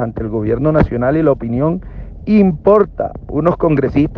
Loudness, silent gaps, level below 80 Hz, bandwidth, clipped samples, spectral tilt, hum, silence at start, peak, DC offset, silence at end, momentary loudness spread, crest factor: -15 LUFS; none; -32 dBFS; 5.4 kHz; under 0.1%; -11 dB/octave; none; 0 s; 0 dBFS; under 0.1%; 0 s; 10 LU; 14 dB